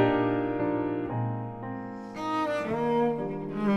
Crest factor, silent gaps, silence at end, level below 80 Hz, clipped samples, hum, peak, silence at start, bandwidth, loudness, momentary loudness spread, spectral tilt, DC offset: 18 dB; none; 0 s; -58 dBFS; under 0.1%; none; -10 dBFS; 0 s; 9.8 kHz; -30 LUFS; 11 LU; -8 dB/octave; under 0.1%